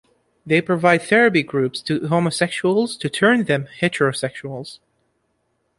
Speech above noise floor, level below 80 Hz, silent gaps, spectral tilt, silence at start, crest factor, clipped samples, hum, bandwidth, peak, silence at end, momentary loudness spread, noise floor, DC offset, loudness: 50 dB; -60 dBFS; none; -5.5 dB/octave; 0.45 s; 18 dB; under 0.1%; none; 11.5 kHz; -2 dBFS; 1.05 s; 12 LU; -69 dBFS; under 0.1%; -19 LUFS